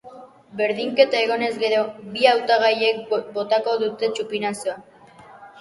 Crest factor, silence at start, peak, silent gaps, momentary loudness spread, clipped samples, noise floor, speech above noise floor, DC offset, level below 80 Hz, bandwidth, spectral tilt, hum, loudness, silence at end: 22 dB; 0.05 s; 0 dBFS; none; 9 LU; under 0.1%; -46 dBFS; 26 dB; under 0.1%; -70 dBFS; 11.5 kHz; -3.5 dB/octave; none; -21 LUFS; 0 s